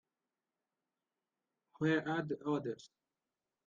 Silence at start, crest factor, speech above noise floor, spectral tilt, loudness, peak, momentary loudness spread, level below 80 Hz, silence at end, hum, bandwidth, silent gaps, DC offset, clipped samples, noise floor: 1.8 s; 22 dB; over 53 dB; -7 dB/octave; -37 LUFS; -20 dBFS; 10 LU; -82 dBFS; 0.8 s; none; 7.4 kHz; none; under 0.1%; under 0.1%; under -90 dBFS